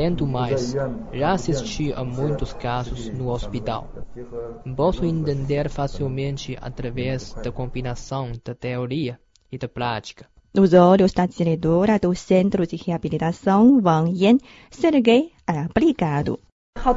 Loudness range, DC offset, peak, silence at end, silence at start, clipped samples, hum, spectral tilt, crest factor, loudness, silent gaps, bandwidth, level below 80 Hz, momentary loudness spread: 10 LU; under 0.1%; -2 dBFS; 0 s; 0 s; under 0.1%; none; -7 dB/octave; 20 dB; -22 LUFS; 16.52-16.73 s; 7.8 kHz; -38 dBFS; 15 LU